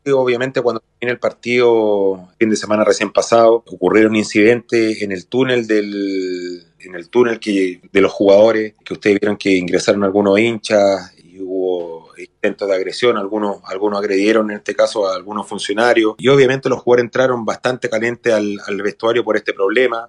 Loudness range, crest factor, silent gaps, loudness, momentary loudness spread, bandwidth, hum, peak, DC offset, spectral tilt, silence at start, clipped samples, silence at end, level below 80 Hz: 4 LU; 16 dB; none; -16 LUFS; 10 LU; 11 kHz; none; 0 dBFS; under 0.1%; -5 dB/octave; 0.05 s; under 0.1%; 0 s; -60 dBFS